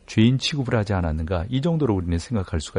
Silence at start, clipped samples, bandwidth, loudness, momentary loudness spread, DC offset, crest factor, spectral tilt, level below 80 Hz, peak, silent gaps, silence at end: 0.1 s; under 0.1%; 10.5 kHz; -23 LUFS; 7 LU; under 0.1%; 16 dB; -6.5 dB/octave; -36 dBFS; -6 dBFS; none; 0 s